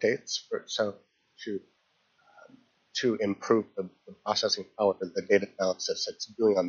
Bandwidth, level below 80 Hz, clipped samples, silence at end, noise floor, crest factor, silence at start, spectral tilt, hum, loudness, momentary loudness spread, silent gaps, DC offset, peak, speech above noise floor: 7.2 kHz; -78 dBFS; under 0.1%; 0 s; -70 dBFS; 20 dB; 0 s; -2.5 dB/octave; none; -30 LUFS; 12 LU; none; under 0.1%; -10 dBFS; 41 dB